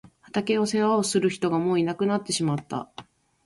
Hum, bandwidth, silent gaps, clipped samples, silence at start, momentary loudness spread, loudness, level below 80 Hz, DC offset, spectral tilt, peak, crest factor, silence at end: none; 11.5 kHz; none; under 0.1%; 0.35 s; 9 LU; -25 LUFS; -64 dBFS; under 0.1%; -5 dB/octave; -10 dBFS; 16 dB; 0.45 s